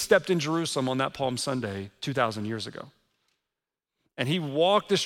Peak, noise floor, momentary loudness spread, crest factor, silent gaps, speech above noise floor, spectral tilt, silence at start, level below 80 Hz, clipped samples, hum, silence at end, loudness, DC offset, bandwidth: -8 dBFS; -88 dBFS; 12 LU; 20 dB; none; 61 dB; -4.5 dB/octave; 0 s; -66 dBFS; under 0.1%; none; 0 s; -27 LUFS; under 0.1%; 16.5 kHz